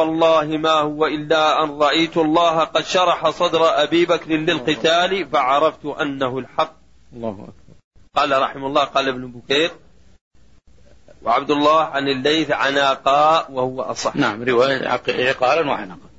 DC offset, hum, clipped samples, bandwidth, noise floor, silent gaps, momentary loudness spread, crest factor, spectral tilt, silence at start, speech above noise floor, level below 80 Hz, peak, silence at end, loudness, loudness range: 0.3%; none; under 0.1%; 8 kHz; -51 dBFS; 7.84-7.91 s, 10.21-10.31 s; 8 LU; 14 dB; -4 dB/octave; 0 s; 33 dB; -54 dBFS; -4 dBFS; 0.2 s; -18 LUFS; 5 LU